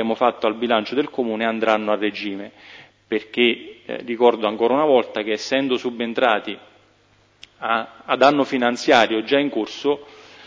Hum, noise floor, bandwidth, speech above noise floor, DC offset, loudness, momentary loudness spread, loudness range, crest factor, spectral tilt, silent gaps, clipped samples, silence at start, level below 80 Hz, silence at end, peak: none; -58 dBFS; 7.8 kHz; 37 dB; under 0.1%; -20 LUFS; 13 LU; 3 LU; 20 dB; -4.5 dB/octave; none; under 0.1%; 0 s; -68 dBFS; 0 s; -2 dBFS